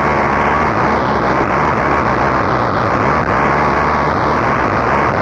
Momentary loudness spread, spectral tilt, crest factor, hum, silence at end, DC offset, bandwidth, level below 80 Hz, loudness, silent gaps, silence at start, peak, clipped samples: 1 LU; -6.5 dB/octave; 10 dB; none; 0 s; under 0.1%; 9.6 kHz; -30 dBFS; -14 LUFS; none; 0 s; -4 dBFS; under 0.1%